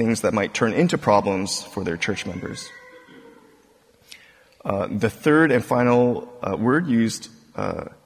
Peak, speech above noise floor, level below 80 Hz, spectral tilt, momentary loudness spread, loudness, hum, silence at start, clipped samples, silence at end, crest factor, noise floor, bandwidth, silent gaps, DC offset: -4 dBFS; 35 dB; -52 dBFS; -5.5 dB/octave; 14 LU; -22 LUFS; none; 0 s; under 0.1%; 0.15 s; 18 dB; -57 dBFS; 16 kHz; none; under 0.1%